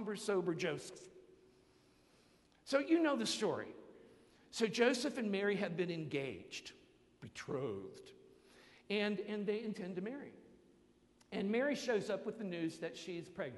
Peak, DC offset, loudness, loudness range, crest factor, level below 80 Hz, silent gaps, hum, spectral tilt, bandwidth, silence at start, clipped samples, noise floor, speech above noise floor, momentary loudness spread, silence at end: -18 dBFS; under 0.1%; -39 LUFS; 6 LU; 22 dB; -78 dBFS; none; none; -4.5 dB/octave; 11.5 kHz; 0 s; under 0.1%; -70 dBFS; 31 dB; 19 LU; 0 s